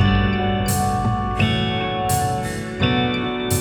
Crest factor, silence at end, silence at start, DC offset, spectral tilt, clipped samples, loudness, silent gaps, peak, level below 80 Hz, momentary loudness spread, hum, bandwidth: 14 dB; 0 s; 0 s; under 0.1%; -5 dB/octave; under 0.1%; -20 LUFS; none; -6 dBFS; -32 dBFS; 4 LU; none; over 20 kHz